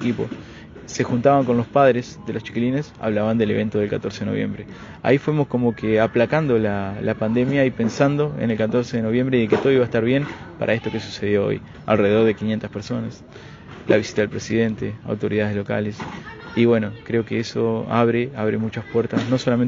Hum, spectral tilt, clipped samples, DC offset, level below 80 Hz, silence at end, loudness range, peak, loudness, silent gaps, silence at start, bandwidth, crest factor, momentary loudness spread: none; -7 dB/octave; under 0.1%; under 0.1%; -52 dBFS; 0 s; 3 LU; -2 dBFS; -21 LUFS; none; 0 s; 7.6 kHz; 20 dB; 11 LU